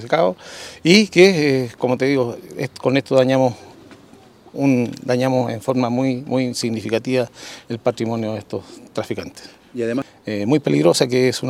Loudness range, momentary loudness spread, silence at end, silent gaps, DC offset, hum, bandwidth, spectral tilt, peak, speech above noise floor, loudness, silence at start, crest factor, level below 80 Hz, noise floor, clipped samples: 8 LU; 16 LU; 0 s; none; under 0.1%; none; 15.5 kHz; -5.5 dB/octave; 0 dBFS; 28 dB; -19 LUFS; 0 s; 18 dB; -60 dBFS; -47 dBFS; under 0.1%